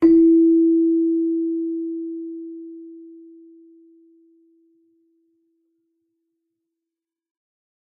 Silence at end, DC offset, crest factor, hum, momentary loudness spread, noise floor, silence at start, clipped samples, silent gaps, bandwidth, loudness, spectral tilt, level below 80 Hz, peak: 4.8 s; under 0.1%; 16 dB; none; 25 LU; -87 dBFS; 0 s; under 0.1%; none; 2.1 kHz; -18 LUFS; -9 dB/octave; -60 dBFS; -6 dBFS